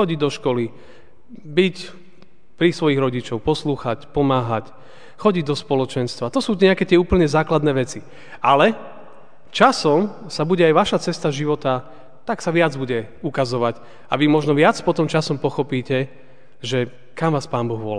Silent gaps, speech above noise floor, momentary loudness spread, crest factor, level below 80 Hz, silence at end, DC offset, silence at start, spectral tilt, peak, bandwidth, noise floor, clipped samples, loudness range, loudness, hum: none; 34 dB; 11 LU; 20 dB; -46 dBFS; 0 s; 1%; 0 s; -6 dB/octave; 0 dBFS; 10 kHz; -53 dBFS; under 0.1%; 4 LU; -20 LUFS; none